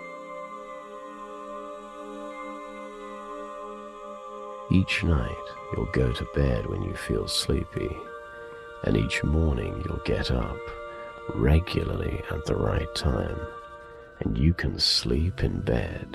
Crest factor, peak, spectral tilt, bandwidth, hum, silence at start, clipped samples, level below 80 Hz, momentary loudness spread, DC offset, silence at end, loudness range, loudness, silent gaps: 20 dB; -8 dBFS; -5.5 dB/octave; 13 kHz; none; 0 s; under 0.1%; -36 dBFS; 16 LU; under 0.1%; 0 s; 12 LU; -28 LUFS; none